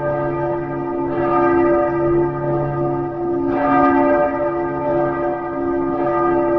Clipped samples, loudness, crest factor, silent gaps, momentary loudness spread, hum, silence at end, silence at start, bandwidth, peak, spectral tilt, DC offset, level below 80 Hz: under 0.1%; -18 LUFS; 14 dB; none; 7 LU; none; 0 s; 0 s; 4.1 kHz; -4 dBFS; -10.5 dB/octave; 0.4%; -42 dBFS